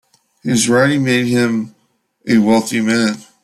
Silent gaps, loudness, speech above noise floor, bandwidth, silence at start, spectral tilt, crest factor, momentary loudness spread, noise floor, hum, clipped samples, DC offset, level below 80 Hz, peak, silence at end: none; -15 LUFS; 45 dB; 14 kHz; 0.45 s; -4.5 dB/octave; 14 dB; 11 LU; -59 dBFS; none; under 0.1%; under 0.1%; -56 dBFS; -2 dBFS; 0.2 s